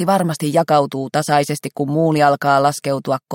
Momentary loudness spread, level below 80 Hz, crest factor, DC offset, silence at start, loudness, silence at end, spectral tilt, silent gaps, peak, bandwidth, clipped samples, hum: 7 LU; -62 dBFS; 16 dB; under 0.1%; 0 s; -17 LUFS; 0 s; -5.5 dB/octave; none; -2 dBFS; 17 kHz; under 0.1%; none